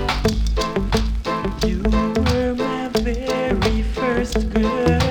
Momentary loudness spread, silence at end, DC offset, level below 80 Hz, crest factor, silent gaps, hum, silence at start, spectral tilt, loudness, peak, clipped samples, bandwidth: 4 LU; 0 s; under 0.1%; -24 dBFS; 16 dB; none; none; 0 s; -6 dB/octave; -21 LUFS; -4 dBFS; under 0.1%; 18 kHz